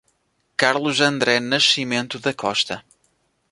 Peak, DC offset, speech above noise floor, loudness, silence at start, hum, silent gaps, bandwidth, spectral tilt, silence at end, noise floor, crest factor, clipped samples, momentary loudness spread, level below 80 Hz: 0 dBFS; under 0.1%; 47 dB; -19 LUFS; 0.6 s; none; none; 11.5 kHz; -3 dB/octave; 0.7 s; -67 dBFS; 22 dB; under 0.1%; 9 LU; -64 dBFS